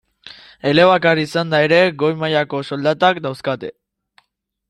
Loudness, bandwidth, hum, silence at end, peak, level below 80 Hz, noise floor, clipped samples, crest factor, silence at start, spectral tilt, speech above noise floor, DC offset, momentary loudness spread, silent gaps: -16 LUFS; 12 kHz; none; 1 s; -2 dBFS; -60 dBFS; -68 dBFS; under 0.1%; 16 dB; 0.25 s; -6 dB/octave; 52 dB; under 0.1%; 12 LU; none